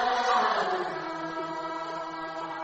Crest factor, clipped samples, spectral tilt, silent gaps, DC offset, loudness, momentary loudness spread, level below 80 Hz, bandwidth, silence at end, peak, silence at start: 18 dB; under 0.1%; -3.5 dB/octave; none; under 0.1%; -30 LUFS; 11 LU; -66 dBFS; 8.4 kHz; 0 s; -12 dBFS; 0 s